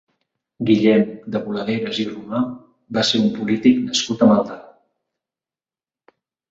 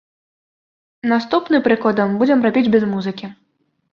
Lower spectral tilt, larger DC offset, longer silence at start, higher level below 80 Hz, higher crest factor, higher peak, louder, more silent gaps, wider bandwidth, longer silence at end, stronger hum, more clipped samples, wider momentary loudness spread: second, -5 dB/octave vs -7.5 dB/octave; neither; second, 0.6 s vs 1.05 s; about the same, -60 dBFS vs -60 dBFS; about the same, 18 dB vs 16 dB; about the same, -2 dBFS vs -2 dBFS; about the same, -19 LUFS vs -17 LUFS; neither; first, 7.8 kHz vs 6.8 kHz; first, 1.9 s vs 0.6 s; neither; neither; about the same, 11 LU vs 11 LU